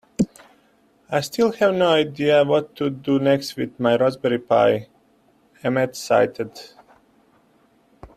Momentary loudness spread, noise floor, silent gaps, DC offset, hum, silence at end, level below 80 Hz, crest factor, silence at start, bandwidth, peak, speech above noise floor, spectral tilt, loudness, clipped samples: 9 LU; -59 dBFS; none; under 0.1%; none; 0.1 s; -60 dBFS; 18 dB; 0.2 s; 14.5 kHz; -4 dBFS; 39 dB; -5.5 dB/octave; -20 LUFS; under 0.1%